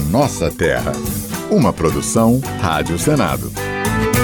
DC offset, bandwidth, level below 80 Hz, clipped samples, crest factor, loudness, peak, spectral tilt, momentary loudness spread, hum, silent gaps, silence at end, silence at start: under 0.1%; 19 kHz; -32 dBFS; under 0.1%; 12 dB; -17 LUFS; -4 dBFS; -5.5 dB/octave; 7 LU; none; none; 0 s; 0 s